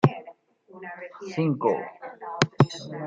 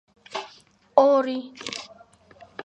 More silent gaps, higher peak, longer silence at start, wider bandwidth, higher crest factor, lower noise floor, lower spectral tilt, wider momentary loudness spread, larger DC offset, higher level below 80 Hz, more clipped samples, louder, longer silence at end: neither; about the same, -2 dBFS vs -2 dBFS; second, 0.05 s vs 0.3 s; second, 7.8 kHz vs 9.2 kHz; about the same, 26 dB vs 24 dB; about the same, -51 dBFS vs -54 dBFS; first, -6.5 dB/octave vs -3.5 dB/octave; second, 18 LU vs 25 LU; neither; about the same, -70 dBFS vs -70 dBFS; neither; about the same, -26 LUFS vs -24 LUFS; about the same, 0 s vs 0 s